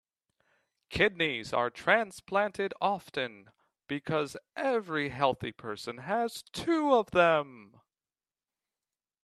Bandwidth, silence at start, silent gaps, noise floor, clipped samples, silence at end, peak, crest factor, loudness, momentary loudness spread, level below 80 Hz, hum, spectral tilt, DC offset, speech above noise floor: 13.5 kHz; 0.9 s; none; under -90 dBFS; under 0.1%; 1.6 s; -8 dBFS; 24 dB; -30 LUFS; 13 LU; -64 dBFS; none; -5 dB/octave; under 0.1%; over 60 dB